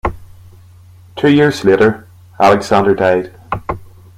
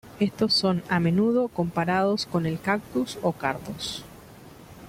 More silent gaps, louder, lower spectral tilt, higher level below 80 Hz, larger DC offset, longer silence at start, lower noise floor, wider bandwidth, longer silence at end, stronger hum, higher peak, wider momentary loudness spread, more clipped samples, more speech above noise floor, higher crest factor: neither; first, -13 LUFS vs -25 LUFS; about the same, -6.5 dB/octave vs -5.5 dB/octave; first, -38 dBFS vs -56 dBFS; neither; about the same, 0.05 s vs 0.05 s; second, -41 dBFS vs -47 dBFS; about the same, 15.5 kHz vs 16 kHz; first, 0.35 s vs 0 s; neither; first, 0 dBFS vs -8 dBFS; first, 15 LU vs 10 LU; neither; first, 30 dB vs 22 dB; about the same, 14 dB vs 18 dB